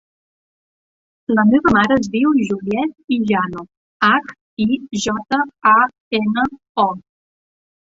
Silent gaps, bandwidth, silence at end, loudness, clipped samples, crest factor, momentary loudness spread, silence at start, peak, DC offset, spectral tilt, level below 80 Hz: 3.04-3.08 s, 3.77-4.00 s, 4.41-4.57 s, 6.00-6.11 s, 6.69-6.75 s; 8 kHz; 0.9 s; -17 LUFS; under 0.1%; 16 dB; 9 LU; 1.3 s; -2 dBFS; under 0.1%; -5 dB/octave; -50 dBFS